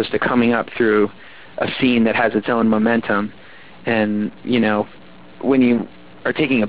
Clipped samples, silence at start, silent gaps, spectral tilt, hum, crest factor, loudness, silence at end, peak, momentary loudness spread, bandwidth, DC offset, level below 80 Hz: under 0.1%; 0 s; none; -10 dB/octave; none; 14 dB; -18 LUFS; 0 s; -4 dBFS; 10 LU; 4 kHz; 0.8%; -52 dBFS